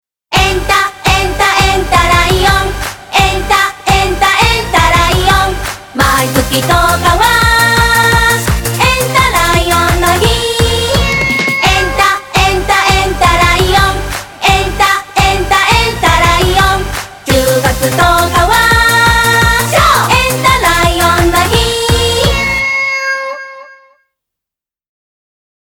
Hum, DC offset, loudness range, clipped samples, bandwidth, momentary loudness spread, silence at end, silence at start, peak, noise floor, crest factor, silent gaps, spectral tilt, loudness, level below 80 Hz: none; under 0.1%; 2 LU; under 0.1%; over 20 kHz; 5 LU; 1.9 s; 0.3 s; 0 dBFS; -85 dBFS; 10 dB; none; -3.5 dB/octave; -9 LUFS; -20 dBFS